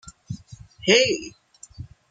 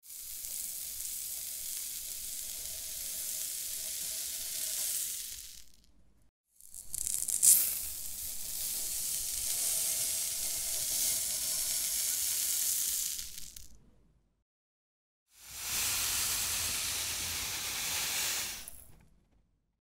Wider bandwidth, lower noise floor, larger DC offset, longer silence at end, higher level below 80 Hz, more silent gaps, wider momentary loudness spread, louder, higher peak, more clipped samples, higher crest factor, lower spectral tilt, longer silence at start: second, 9.6 kHz vs 16.5 kHz; second, -45 dBFS vs -72 dBFS; neither; second, 0.25 s vs 0.85 s; first, -54 dBFS vs -60 dBFS; second, none vs 6.29-6.44 s, 14.42-15.26 s; first, 25 LU vs 10 LU; first, -20 LUFS vs -31 LUFS; first, -2 dBFS vs -6 dBFS; neither; second, 22 dB vs 30 dB; first, -3 dB/octave vs 1.5 dB/octave; about the same, 0.05 s vs 0.05 s